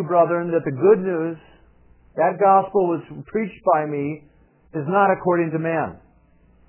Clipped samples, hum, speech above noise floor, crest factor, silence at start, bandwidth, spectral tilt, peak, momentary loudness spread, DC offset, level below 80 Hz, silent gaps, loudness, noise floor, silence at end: under 0.1%; none; 36 dB; 18 dB; 0 s; 3.2 kHz; -11.5 dB/octave; -4 dBFS; 13 LU; under 0.1%; -58 dBFS; none; -20 LUFS; -55 dBFS; 0.7 s